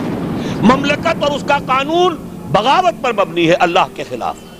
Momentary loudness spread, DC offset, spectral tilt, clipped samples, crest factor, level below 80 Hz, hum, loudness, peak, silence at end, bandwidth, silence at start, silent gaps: 9 LU; under 0.1%; -5.5 dB/octave; under 0.1%; 14 dB; -42 dBFS; none; -15 LUFS; 0 dBFS; 0 s; 15.5 kHz; 0 s; none